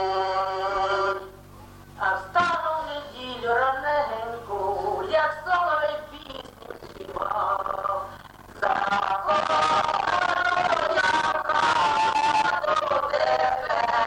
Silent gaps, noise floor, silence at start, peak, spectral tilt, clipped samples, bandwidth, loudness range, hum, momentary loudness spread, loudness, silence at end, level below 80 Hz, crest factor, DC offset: none; -46 dBFS; 0 s; -10 dBFS; -3 dB/octave; under 0.1%; 17 kHz; 5 LU; none; 13 LU; -24 LUFS; 0 s; -54 dBFS; 14 dB; under 0.1%